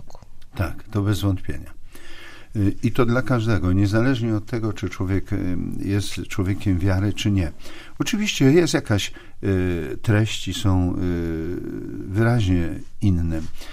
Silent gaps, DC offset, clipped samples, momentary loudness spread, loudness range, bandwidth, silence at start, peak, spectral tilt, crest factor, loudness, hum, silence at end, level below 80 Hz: none; under 0.1%; under 0.1%; 11 LU; 3 LU; 15.5 kHz; 0 s; -4 dBFS; -6 dB/octave; 18 dB; -23 LUFS; none; 0 s; -36 dBFS